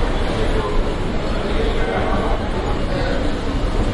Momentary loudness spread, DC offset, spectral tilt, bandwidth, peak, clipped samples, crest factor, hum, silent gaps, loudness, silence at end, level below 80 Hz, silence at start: 3 LU; under 0.1%; -6.5 dB/octave; 11 kHz; -6 dBFS; under 0.1%; 12 dB; none; none; -22 LUFS; 0 s; -22 dBFS; 0 s